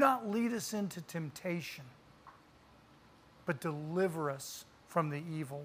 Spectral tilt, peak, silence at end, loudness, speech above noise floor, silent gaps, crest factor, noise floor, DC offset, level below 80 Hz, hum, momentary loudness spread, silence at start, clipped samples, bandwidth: -5.5 dB/octave; -14 dBFS; 0 s; -37 LUFS; 26 dB; none; 22 dB; -62 dBFS; under 0.1%; -74 dBFS; none; 14 LU; 0 s; under 0.1%; 15.5 kHz